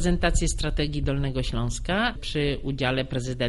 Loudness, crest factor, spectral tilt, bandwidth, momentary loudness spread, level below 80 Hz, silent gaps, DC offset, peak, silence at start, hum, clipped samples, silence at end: -27 LUFS; 18 dB; -5 dB/octave; 11.5 kHz; 4 LU; -30 dBFS; none; under 0.1%; -8 dBFS; 0 s; none; under 0.1%; 0 s